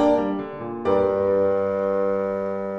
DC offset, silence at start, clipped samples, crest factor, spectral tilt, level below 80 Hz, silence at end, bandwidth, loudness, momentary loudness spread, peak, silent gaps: under 0.1%; 0 s; under 0.1%; 14 dB; -8 dB/octave; -54 dBFS; 0 s; 6.4 kHz; -23 LUFS; 7 LU; -8 dBFS; none